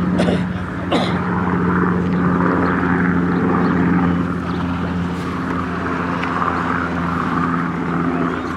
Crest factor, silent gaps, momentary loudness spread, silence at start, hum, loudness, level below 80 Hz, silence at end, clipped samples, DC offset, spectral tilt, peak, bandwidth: 16 dB; none; 5 LU; 0 s; none; -19 LUFS; -40 dBFS; 0 s; under 0.1%; under 0.1%; -8 dB/octave; -2 dBFS; 9.8 kHz